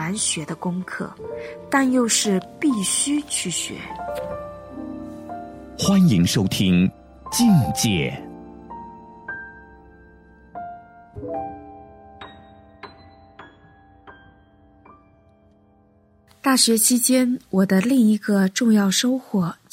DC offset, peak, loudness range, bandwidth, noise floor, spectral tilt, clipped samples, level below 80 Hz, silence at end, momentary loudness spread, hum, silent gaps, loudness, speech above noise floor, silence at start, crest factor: under 0.1%; -4 dBFS; 19 LU; 16 kHz; -57 dBFS; -4 dB/octave; under 0.1%; -52 dBFS; 0.2 s; 22 LU; none; none; -20 LUFS; 37 dB; 0 s; 20 dB